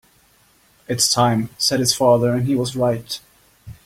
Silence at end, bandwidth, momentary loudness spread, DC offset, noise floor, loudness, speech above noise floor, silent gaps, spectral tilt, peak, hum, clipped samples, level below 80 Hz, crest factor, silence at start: 0.15 s; 16.5 kHz; 12 LU; under 0.1%; -56 dBFS; -18 LUFS; 38 dB; none; -4 dB/octave; -2 dBFS; none; under 0.1%; -52 dBFS; 18 dB; 0.9 s